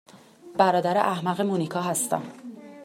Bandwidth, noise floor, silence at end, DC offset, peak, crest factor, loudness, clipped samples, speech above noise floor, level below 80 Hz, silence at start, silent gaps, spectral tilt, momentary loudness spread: 16 kHz; -47 dBFS; 0 s; under 0.1%; -6 dBFS; 20 dB; -25 LUFS; under 0.1%; 23 dB; -72 dBFS; 0.15 s; none; -4.5 dB/octave; 17 LU